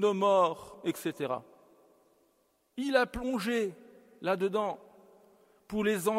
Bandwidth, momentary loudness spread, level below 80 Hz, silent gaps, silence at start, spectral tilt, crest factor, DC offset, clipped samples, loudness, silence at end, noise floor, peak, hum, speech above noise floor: 16 kHz; 12 LU; -60 dBFS; none; 0 s; -5 dB/octave; 20 dB; under 0.1%; under 0.1%; -31 LUFS; 0 s; -72 dBFS; -12 dBFS; none; 42 dB